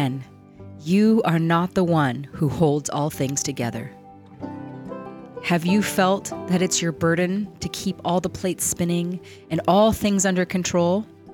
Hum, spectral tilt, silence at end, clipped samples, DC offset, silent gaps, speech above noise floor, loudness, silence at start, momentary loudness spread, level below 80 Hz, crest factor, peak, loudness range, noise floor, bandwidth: none; -5 dB/octave; 0 s; under 0.1%; under 0.1%; none; 21 dB; -22 LUFS; 0 s; 17 LU; -52 dBFS; 16 dB; -6 dBFS; 4 LU; -42 dBFS; 18.5 kHz